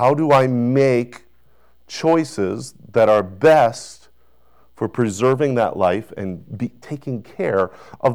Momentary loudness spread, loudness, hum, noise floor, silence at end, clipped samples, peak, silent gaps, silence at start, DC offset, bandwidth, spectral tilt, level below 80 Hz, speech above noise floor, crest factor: 15 LU; -19 LUFS; none; -59 dBFS; 0 s; under 0.1%; -6 dBFS; none; 0 s; 0.4%; 14.5 kHz; -6.5 dB/octave; -56 dBFS; 41 dB; 14 dB